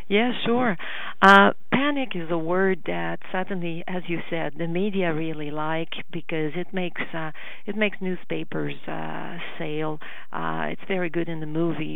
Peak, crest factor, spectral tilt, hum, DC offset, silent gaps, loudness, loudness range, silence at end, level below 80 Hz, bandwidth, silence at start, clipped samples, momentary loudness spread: 0 dBFS; 26 dB; -6.5 dB/octave; none; 4%; none; -25 LUFS; 9 LU; 0 s; -70 dBFS; over 20 kHz; 0.1 s; under 0.1%; 11 LU